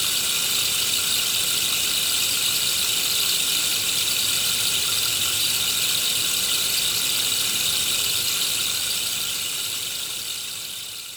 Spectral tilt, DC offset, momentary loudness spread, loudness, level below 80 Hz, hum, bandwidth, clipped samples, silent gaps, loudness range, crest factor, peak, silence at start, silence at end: 1 dB/octave; under 0.1%; 6 LU; -20 LUFS; -58 dBFS; none; over 20 kHz; under 0.1%; none; 2 LU; 16 dB; -8 dBFS; 0 s; 0 s